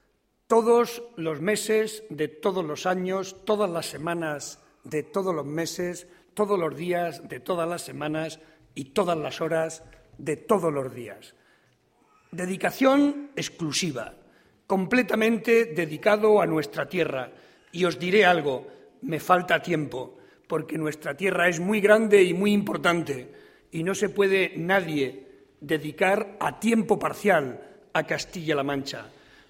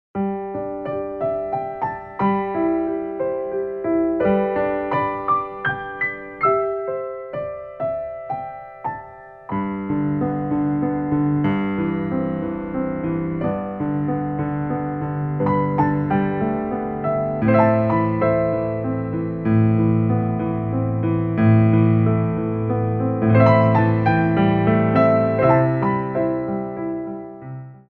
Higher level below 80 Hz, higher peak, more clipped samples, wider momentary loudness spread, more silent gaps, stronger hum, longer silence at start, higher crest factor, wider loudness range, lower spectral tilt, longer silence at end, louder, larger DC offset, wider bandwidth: second, -64 dBFS vs -46 dBFS; about the same, -4 dBFS vs -2 dBFS; neither; first, 15 LU vs 11 LU; neither; neither; first, 0.5 s vs 0.15 s; about the same, 22 dB vs 18 dB; about the same, 7 LU vs 7 LU; second, -5 dB/octave vs -11.5 dB/octave; first, 0.4 s vs 0.15 s; second, -25 LUFS vs -21 LUFS; neither; first, 16.5 kHz vs 4.3 kHz